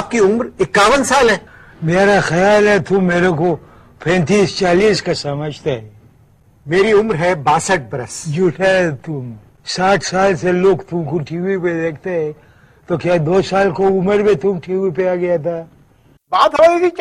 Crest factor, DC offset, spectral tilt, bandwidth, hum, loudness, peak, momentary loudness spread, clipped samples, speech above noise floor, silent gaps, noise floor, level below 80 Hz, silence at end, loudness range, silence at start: 14 dB; under 0.1%; -5 dB/octave; 12.5 kHz; none; -15 LUFS; -2 dBFS; 12 LU; under 0.1%; 36 dB; none; -51 dBFS; -44 dBFS; 0 s; 4 LU; 0 s